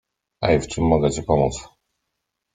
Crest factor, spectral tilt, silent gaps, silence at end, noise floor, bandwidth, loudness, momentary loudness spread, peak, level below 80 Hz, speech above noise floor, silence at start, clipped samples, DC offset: 18 dB; -6 dB/octave; none; 0.9 s; -79 dBFS; 9.6 kHz; -21 LUFS; 7 LU; -4 dBFS; -40 dBFS; 59 dB; 0.4 s; under 0.1%; under 0.1%